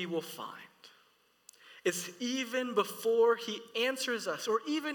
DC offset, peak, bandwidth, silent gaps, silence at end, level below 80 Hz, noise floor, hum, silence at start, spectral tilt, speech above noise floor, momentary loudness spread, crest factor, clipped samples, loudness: under 0.1%; -16 dBFS; 19 kHz; none; 0 s; under -90 dBFS; -69 dBFS; none; 0 s; -3 dB/octave; 36 dB; 12 LU; 18 dB; under 0.1%; -33 LUFS